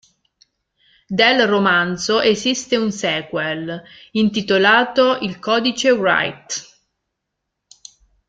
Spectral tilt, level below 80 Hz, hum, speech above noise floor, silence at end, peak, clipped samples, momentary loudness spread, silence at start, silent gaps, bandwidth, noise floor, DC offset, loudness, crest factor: -3.5 dB/octave; -58 dBFS; none; 61 dB; 1.65 s; 0 dBFS; under 0.1%; 13 LU; 1.1 s; none; 9.4 kHz; -78 dBFS; under 0.1%; -17 LUFS; 18 dB